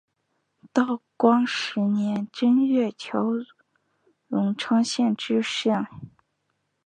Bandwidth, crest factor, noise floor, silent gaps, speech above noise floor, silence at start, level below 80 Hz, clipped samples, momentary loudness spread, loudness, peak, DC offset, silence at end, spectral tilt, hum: 9.6 kHz; 20 dB; -75 dBFS; none; 52 dB; 0.75 s; -72 dBFS; under 0.1%; 8 LU; -24 LUFS; -4 dBFS; under 0.1%; 0.8 s; -5.5 dB/octave; none